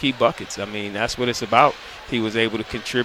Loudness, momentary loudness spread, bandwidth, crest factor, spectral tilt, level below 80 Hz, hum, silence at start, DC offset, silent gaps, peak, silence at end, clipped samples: -22 LUFS; 11 LU; 16 kHz; 22 dB; -4 dB/octave; -48 dBFS; none; 0 s; under 0.1%; none; 0 dBFS; 0 s; under 0.1%